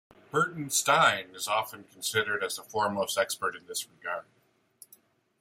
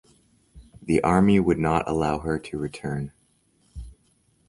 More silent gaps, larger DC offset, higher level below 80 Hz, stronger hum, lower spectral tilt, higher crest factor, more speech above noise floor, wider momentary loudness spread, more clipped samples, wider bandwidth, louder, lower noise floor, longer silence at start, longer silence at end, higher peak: neither; neither; second, -74 dBFS vs -44 dBFS; neither; second, -2 dB/octave vs -7.5 dB/octave; about the same, 22 dB vs 20 dB; second, 32 dB vs 42 dB; second, 13 LU vs 24 LU; neither; first, 16.5 kHz vs 11.5 kHz; second, -29 LUFS vs -23 LUFS; about the same, -62 dBFS vs -65 dBFS; second, 0.35 s vs 0.55 s; first, 1.2 s vs 0.6 s; second, -10 dBFS vs -4 dBFS